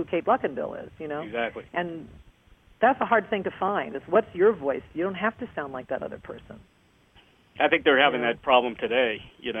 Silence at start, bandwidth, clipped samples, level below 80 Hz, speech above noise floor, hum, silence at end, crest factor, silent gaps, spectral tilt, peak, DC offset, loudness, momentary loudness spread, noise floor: 0 s; 3.8 kHz; under 0.1%; -60 dBFS; 33 dB; none; 0 s; 22 dB; none; -7 dB/octave; -4 dBFS; under 0.1%; -25 LUFS; 14 LU; -59 dBFS